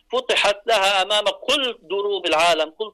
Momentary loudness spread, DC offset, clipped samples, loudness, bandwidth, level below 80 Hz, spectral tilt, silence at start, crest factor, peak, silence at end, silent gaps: 6 LU; under 0.1%; under 0.1%; -19 LUFS; 13.5 kHz; -58 dBFS; -1 dB/octave; 0.1 s; 10 dB; -10 dBFS; 0.05 s; none